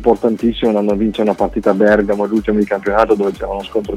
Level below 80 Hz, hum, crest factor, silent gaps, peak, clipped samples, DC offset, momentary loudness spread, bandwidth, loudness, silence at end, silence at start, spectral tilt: -36 dBFS; none; 14 dB; none; 0 dBFS; under 0.1%; under 0.1%; 5 LU; 12.5 kHz; -15 LUFS; 0 s; 0 s; -7 dB/octave